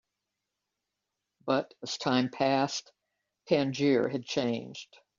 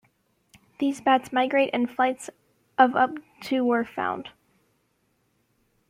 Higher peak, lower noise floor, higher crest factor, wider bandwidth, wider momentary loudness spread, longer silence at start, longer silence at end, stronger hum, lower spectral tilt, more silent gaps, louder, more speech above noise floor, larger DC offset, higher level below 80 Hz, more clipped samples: second, -12 dBFS vs -6 dBFS; first, -86 dBFS vs -70 dBFS; about the same, 20 dB vs 22 dB; second, 7.4 kHz vs 15 kHz; second, 11 LU vs 15 LU; first, 1.45 s vs 0.8 s; second, 0.35 s vs 1.6 s; neither; about the same, -4 dB/octave vs -4 dB/octave; neither; second, -30 LUFS vs -24 LUFS; first, 57 dB vs 47 dB; neither; about the same, -74 dBFS vs -72 dBFS; neither